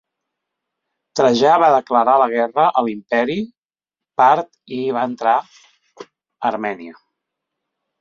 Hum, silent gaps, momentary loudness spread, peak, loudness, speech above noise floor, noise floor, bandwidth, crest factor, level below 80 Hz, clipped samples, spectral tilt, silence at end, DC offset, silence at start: none; 3.58-3.70 s; 13 LU; -2 dBFS; -17 LUFS; 71 dB; -88 dBFS; 7.6 kHz; 18 dB; -64 dBFS; under 0.1%; -5 dB/octave; 1.1 s; under 0.1%; 1.15 s